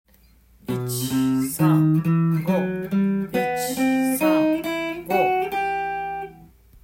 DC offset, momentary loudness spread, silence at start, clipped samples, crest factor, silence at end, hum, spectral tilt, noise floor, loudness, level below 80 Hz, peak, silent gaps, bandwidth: under 0.1%; 10 LU; 0.7 s; under 0.1%; 16 dB; 0.4 s; none; -6 dB/octave; -55 dBFS; -22 LUFS; -54 dBFS; -6 dBFS; none; 16.5 kHz